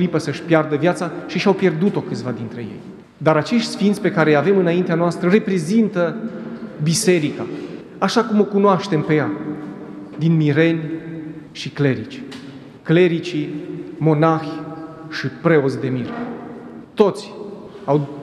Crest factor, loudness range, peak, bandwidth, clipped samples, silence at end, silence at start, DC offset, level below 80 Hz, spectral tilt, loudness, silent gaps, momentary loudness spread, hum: 18 dB; 4 LU; 0 dBFS; 13 kHz; under 0.1%; 0 s; 0 s; under 0.1%; -62 dBFS; -6 dB/octave; -19 LUFS; none; 17 LU; none